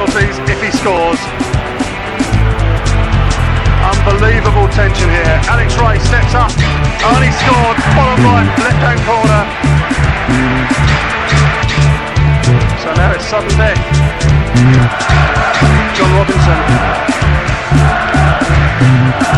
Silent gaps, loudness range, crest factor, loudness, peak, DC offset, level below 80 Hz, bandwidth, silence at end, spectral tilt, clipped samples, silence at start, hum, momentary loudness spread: none; 2 LU; 10 dB; -11 LUFS; 0 dBFS; 0.3%; -16 dBFS; 11.5 kHz; 0 s; -6 dB/octave; under 0.1%; 0 s; none; 4 LU